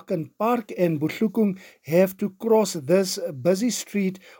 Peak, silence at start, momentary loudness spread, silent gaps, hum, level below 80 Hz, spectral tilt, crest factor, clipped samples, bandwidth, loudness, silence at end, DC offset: -6 dBFS; 0.1 s; 6 LU; none; none; -72 dBFS; -5.5 dB/octave; 18 dB; under 0.1%; 17 kHz; -23 LUFS; 0.2 s; under 0.1%